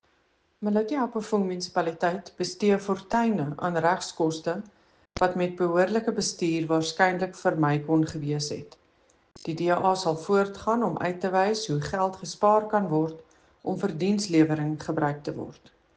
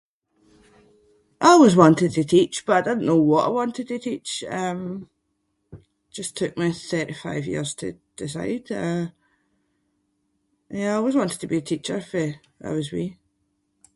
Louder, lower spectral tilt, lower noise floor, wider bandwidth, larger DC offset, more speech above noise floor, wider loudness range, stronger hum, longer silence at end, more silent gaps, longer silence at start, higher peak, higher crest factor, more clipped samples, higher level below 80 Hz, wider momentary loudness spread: second, -26 LUFS vs -22 LUFS; about the same, -5.5 dB/octave vs -5.5 dB/octave; second, -68 dBFS vs -73 dBFS; second, 9.8 kHz vs 11.5 kHz; neither; second, 42 dB vs 51 dB; second, 2 LU vs 12 LU; neither; second, 0.45 s vs 0.85 s; neither; second, 0.6 s vs 1.4 s; second, -6 dBFS vs 0 dBFS; about the same, 20 dB vs 22 dB; neither; about the same, -60 dBFS vs -60 dBFS; second, 9 LU vs 17 LU